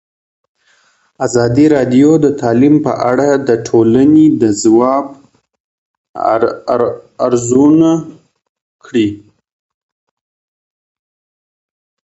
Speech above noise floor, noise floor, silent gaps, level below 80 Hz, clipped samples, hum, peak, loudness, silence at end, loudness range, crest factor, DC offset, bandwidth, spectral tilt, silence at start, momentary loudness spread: 44 dB; -54 dBFS; 5.60-6.14 s, 8.49-8.55 s, 8.61-8.79 s; -50 dBFS; under 0.1%; none; 0 dBFS; -11 LUFS; 2.85 s; 14 LU; 12 dB; under 0.1%; 8.2 kHz; -6.5 dB/octave; 1.2 s; 10 LU